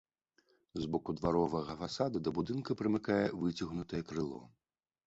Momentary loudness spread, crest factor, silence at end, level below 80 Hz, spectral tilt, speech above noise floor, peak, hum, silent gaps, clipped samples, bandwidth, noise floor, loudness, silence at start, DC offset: 8 LU; 18 dB; 0.6 s; -60 dBFS; -6 dB/octave; 39 dB; -18 dBFS; none; none; under 0.1%; 8 kHz; -74 dBFS; -36 LUFS; 0.75 s; under 0.1%